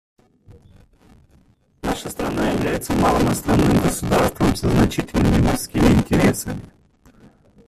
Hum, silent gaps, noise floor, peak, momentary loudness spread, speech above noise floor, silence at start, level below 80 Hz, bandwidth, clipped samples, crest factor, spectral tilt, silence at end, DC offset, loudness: none; none; -56 dBFS; -2 dBFS; 10 LU; 38 dB; 0.5 s; -32 dBFS; 15.5 kHz; under 0.1%; 18 dB; -6 dB/octave; 1 s; under 0.1%; -19 LUFS